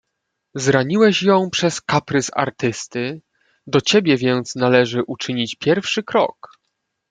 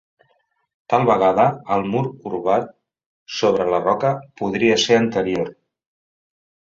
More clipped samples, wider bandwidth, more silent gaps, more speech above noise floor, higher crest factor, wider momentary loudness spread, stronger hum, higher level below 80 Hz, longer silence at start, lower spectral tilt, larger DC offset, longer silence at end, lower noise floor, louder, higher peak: neither; first, 9.4 kHz vs 7.8 kHz; second, none vs 3.06-3.26 s; first, 58 dB vs 47 dB; about the same, 18 dB vs 18 dB; about the same, 9 LU vs 10 LU; neither; about the same, -60 dBFS vs -58 dBFS; second, 0.55 s vs 0.9 s; about the same, -4.5 dB/octave vs -5 dB/octave; neither; second, 0.8 s vs 1.15 s; first, -76 dBFS vs -66 dBFS; about the same, -18 LUFS vs -19 LUFS; about the same, -2 dBFS vs -2 dBFS